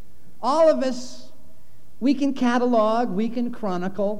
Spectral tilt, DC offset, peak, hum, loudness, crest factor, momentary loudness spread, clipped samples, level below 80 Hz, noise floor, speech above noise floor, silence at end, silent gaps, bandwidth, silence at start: -6 dB/octave; 4%; -8 dBFS; none; -22 LUFS; 14 dB; 9 LU; under 0.1%; -62 dBFS; -56 dBFS; 34 dB; 0 s; none; 11 kHz; 0.4 s